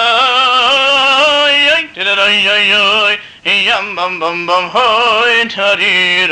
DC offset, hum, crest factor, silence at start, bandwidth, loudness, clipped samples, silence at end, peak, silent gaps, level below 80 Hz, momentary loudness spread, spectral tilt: under 0.1%; none; 10 dB; 0 s; 11 kHz; -9 LUFS; under 0.1%; 0 s; -2 dBFS; none; -52 dBFS; 6 LU; -1.5 dB/octave